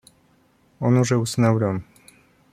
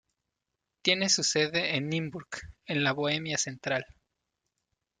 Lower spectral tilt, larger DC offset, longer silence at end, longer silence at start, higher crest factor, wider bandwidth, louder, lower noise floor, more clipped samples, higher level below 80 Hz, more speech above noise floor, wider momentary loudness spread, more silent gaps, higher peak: first, -6.5 dB/octave vs -2.5 dB/octave; neither; second, 0.7 s vs 1.15 s; about the same, 0.8 s vs 0.85 s; about the same, 18 dB vs 22 dB; first, 14.5 kHz vs 11 kHz; first, -21 LUFS vs -28 LUFS; second, -60 dBFS vs -85 dBFS; neither; first, -58 dBFS vs -64 dBFS; second, 40 dB vs 56 dB; second, 7 LU vs 13 LU; neither; first, -6 dBFS vs -10 dBFS